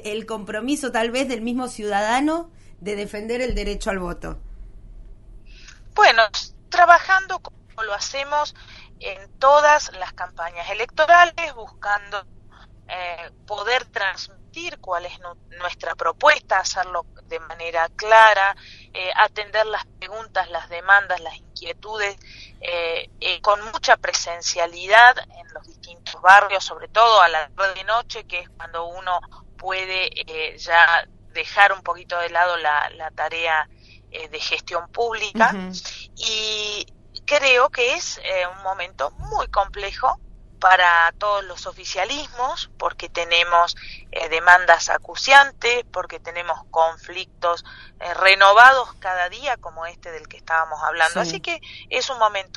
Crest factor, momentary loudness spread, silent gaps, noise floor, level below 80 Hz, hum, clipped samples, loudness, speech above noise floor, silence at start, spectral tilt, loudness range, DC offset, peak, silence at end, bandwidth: 20 dB; 19 LU; none; -47 dBFS; -44 dBFS; none; under 0.1%; -19 LUFS; 27 dB; 0 s; -1.5 dB/octave; 8 LU; under 0.1%; 0 dBFS; 0.15 s; 11.5 kHz